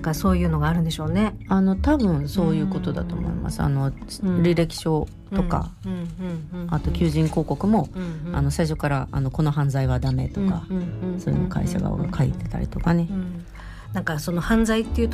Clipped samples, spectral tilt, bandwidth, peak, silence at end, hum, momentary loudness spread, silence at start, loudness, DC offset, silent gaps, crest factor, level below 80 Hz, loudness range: under 0.1%; -7 dB/octave; 15 kHz; -8 dBFS; 0 s; none; 9 LU; 0 s; -24 LUFS; under 0.1%; none; 14 dB; -34 dBFS; 3 LU